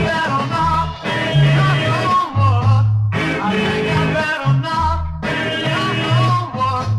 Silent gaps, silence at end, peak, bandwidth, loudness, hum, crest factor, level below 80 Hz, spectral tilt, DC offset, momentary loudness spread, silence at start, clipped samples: none; 0 s; -4 dBFS; 11.5 kHz; -17 LUFS; none; 12 dB; -34 dBFS; -6.5 dB/octave; under 0.1%; 5 LU; 0 s; under 0.1%